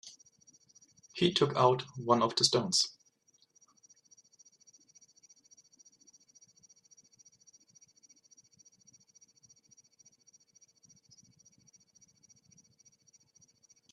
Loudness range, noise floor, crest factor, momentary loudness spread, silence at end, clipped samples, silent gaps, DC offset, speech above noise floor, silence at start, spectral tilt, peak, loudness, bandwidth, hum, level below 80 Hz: 7 LU; -70 dBFS; 28 dB; 9 LU; 11 s; under 0.1%; none; under 0.1%; 41 dB; 0.05 s; -3.5 dB/octave; -10 dBFS; -29 LUFS; 12.5 kHz; none; -76 dBFS